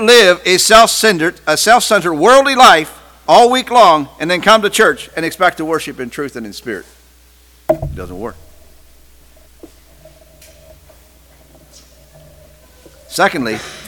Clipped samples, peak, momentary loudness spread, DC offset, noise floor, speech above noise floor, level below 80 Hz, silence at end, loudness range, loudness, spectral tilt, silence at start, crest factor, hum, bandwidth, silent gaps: 0.6%; 0 dBFS; 19 LU; under 0.1%; -46 dBFS; 35 dB; -42 dBFS; 0 s; 17 LU; -10 LUFS; -2.5 dB/octave; 0 s; 14 dB; none; 19.5 kHz; none